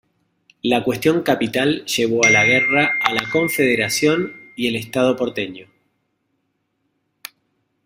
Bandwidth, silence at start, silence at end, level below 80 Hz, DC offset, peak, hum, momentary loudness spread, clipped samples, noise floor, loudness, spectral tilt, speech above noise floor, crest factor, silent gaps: 16 kHz; 0.65 s; 2.2 s; -58 dBFS; under 0.1%; 0 dBFS; none; 15 LU; under 0.1%; -71 dBFS; -17 LUFS; -3.5 dB/octave; 53 dB; 20 dB; none